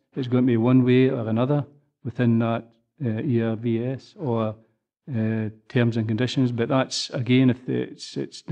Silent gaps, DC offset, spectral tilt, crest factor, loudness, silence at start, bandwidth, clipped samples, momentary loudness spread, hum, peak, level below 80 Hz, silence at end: none; under 0.1%; -7 dB/octave; 18 dB; -23 LUFS; 0.15 s; 9.4 kHz; under 0.1%; 13 LU; none; -6 dBFS; -68 dBFS; 0 s